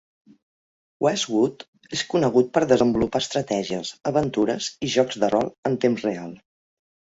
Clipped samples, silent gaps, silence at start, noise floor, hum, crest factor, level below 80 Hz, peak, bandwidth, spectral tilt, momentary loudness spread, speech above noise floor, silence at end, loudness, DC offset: under 0.1%; 1.68-1.73 s, 5.58-5.63 s; 1 s; under -90 dBFS; none; 20 dB; -56 dBFS; -4 dBFS; 8 kHz; -5 dB/octave; 9 LU; over 68 dB; 0.85 s; -23 LUFS; under 0.1%